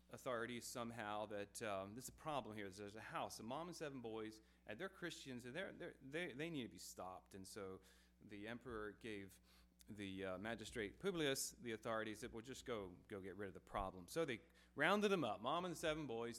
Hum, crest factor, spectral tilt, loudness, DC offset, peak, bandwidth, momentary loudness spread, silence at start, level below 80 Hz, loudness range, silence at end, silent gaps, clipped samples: none; 24 dB; -4 dB/octave; -48 LUFS; under 0.1%; -24 dBFS; 16 kHz; 13 LU; 0.1 s; -70 dBFS; 8 LU; 0 s; none; under 0.1%